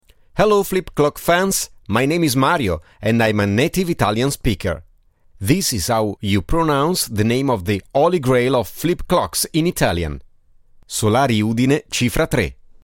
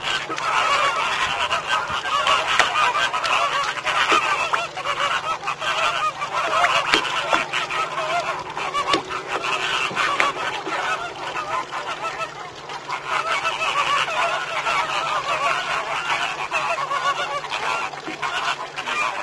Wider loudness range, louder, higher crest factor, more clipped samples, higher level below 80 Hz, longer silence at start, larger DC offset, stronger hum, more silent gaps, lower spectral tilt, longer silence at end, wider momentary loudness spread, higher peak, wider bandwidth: about the same, 2 LU vs 4 LU; first, -18 LUFS vs -21 LUFS; about the same, 18 dB vs 22 dB; neither; first, -36 dBFS vs -56 dBFS; first, 0.35 s vs 0 s; neither; neither; neither; first, -5 dB/octave vs -1.5 dB/octave; first, 0.3 s vs 0 s; second, 6 LU vs 9 LU; about the same, 0 dBFS vs 0 dBFS; first, 17 kHz vs 11 kHz